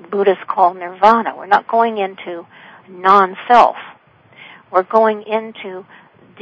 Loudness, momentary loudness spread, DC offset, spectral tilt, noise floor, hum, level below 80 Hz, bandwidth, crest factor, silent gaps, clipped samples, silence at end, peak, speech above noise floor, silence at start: -15 LUFS; 19 LU; under 0.1%; -6 dB/octave; -46 dBFS; none; -62 dBFS; 8 kHz; 16 dB; none; 0.3%; 0.6 s; 0 dBFS; 31 dB; 0.1 s